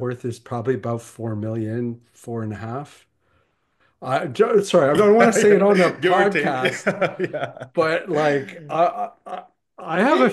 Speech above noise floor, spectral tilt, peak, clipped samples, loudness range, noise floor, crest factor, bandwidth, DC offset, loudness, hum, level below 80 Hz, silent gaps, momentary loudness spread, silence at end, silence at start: 45 dB; -5.5 dB/octave; -2 dBFS; under 0.1%; 12 LU; -65 dBFS; 20 dB; 12.5 kHz; under 0.1%; -20 LUFS; none; -64 dBFS; none; 16 LU; 0 s; 0 s